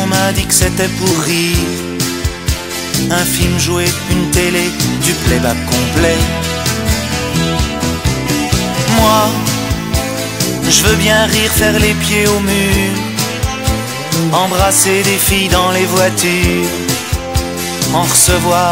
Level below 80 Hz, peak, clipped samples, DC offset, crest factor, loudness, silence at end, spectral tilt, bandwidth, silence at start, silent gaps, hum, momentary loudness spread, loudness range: -24 dBFS; 0 dBFS; under 0.1%; 0.5%; 14 dB; -12 LUFS; 0 s; -3.5 dB/octave; 16.5 kHz; 0 s; none; none; 7 LU; 3 LU